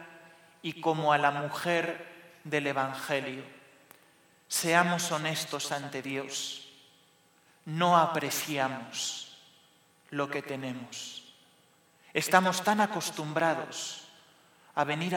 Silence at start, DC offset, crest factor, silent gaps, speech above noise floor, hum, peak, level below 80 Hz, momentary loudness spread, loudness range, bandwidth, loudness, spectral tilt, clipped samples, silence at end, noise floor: 0 s; under 0.1%; 26 dB; none; 34 dB; none; -6 dBFS; -80 dBFS; 17 LU; 5 LU; 19 kHz; -30 LUFS; -3.5 dB/octave; under 0.1%; 0 s; -64 dBFS